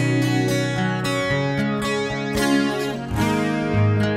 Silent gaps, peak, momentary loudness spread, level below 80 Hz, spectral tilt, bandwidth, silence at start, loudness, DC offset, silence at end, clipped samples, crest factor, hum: none; -6 dBFS; 4 LU; -42 dBFS; -6 dB/octave; 16 kHz; 0 s; -21 LUFS; under 0.1%; 0 s; under 0.1%; 14 dB; none